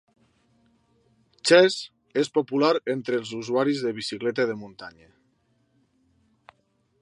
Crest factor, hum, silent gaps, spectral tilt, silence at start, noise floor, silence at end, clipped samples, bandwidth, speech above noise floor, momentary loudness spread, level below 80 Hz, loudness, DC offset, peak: 22 dB; none; none; -4 dB/octave; 1.45 s; -69 dBFS; 2.1 s; under 0.1%; 11.5 kHz; 45 dB; 17 LU; -74 dBFS; -24 LUFS; under 0.1%; -4 dBFS